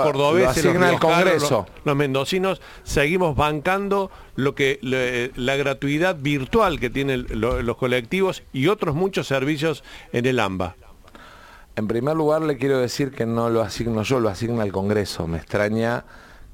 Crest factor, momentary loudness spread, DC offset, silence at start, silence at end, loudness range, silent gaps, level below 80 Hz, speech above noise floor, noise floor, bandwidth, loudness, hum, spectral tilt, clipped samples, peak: 16 dB; 8 LU; under 0.1%; 0 s; 0 s; 4 LU; none; -42 dBFS; 24 dB; -45 dBFS; 17 kHz; -22 LUFS; none; -5.5 dB/octave; under 0.1%; -4 dBFS